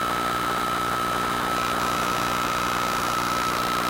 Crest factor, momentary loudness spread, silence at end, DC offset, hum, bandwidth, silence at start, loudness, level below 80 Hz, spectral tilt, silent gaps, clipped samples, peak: 14 dB; 1 LU; 0 s; under 0.1%; 60 Hz at -35 dBFS; 17 kHz; 0 s; -24 LUFS; -46 dBFS; -3 dB/octave; none; under 0.1%; -10 dBFS